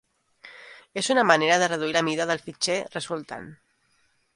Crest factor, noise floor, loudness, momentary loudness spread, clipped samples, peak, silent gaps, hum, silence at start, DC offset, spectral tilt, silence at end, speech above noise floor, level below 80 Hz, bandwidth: 24 dB; -67 dBFS; -23 LUFS; 20 LU; under 0.1%; -2 dBFS; none; none; 0.45 s; under 0.1%; -3 dB/octave; 0.8 s; 43 dB; -70 dBFS; 11.5 kHz